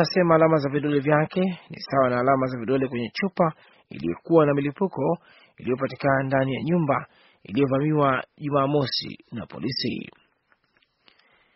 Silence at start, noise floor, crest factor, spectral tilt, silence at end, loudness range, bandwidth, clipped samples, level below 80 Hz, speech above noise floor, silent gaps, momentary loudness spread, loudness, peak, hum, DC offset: 0 s; -67 dBFS; 20 dB; -5.5 dB/octave; 1.45 s; 3 LU; 6 kHz; under 0.1%; -60 dBFS; 44 dB; none; 12 LU; -24 LUFS; -4 dBFS; none; under 0.1%